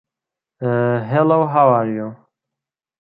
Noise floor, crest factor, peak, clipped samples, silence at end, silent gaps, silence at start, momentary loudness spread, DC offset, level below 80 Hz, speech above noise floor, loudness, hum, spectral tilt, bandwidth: -86 dBFS; 16 dB; -2 dBFS; under 0.1%; 0.85 s; none; 0.6 s; 13 LU; under 0.1%; -66 dBFS; 70 dB; -17 LUFS; none; -11.5 dB/octave; 4.2 kHz